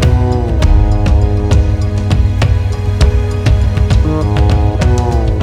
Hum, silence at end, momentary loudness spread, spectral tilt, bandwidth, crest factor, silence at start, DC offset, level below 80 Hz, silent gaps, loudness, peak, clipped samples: none; 0 s; 2 LU; -7 dB/octave; 10.5 kHz; 10 dB; 0 s; under 0.1%; -14 dBFS; none; -13 LUFS; 0 dBFS; under 0.1%